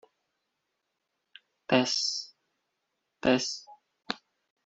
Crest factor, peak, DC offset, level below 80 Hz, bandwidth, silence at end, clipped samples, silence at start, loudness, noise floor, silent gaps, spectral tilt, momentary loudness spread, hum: 24 dB; -8 dBFS; under 0.1%; -70 dBFS; 8 kHz; 0.5 s; under 0.1%; 1.7 s; -29 LUFS; -82 dBFS; none; -3 dB/octave; 15 LU; none